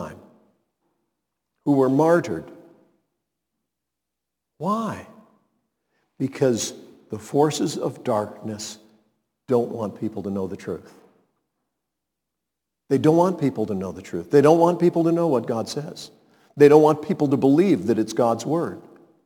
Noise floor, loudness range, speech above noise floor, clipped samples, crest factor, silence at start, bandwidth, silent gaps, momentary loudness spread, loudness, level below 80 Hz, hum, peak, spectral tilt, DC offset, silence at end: -84 dBFS; 13 LU; 63 dB; under 0.1%; 22 dB; 0 s; 18 kHz; none; 17 LU; -21 LUFS; -68 dBFS; none; -2 dBFS; -6.5 dB/octave; under 0.1%; 0.45 s